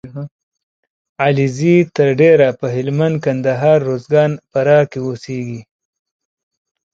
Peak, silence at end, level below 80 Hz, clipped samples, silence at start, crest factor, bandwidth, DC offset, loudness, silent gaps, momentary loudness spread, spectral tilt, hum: 0 dBFS; 1.3 s; -56 dBFS; under 0.1%; 0.05 s; 16 dB; 7.8 kHz; under 0.1%; -15 LUFS; 0.31-0.52 s, 0.63-0.83 s, 0.90-1.15 s; 14 LU; -7.5 dB/octave; none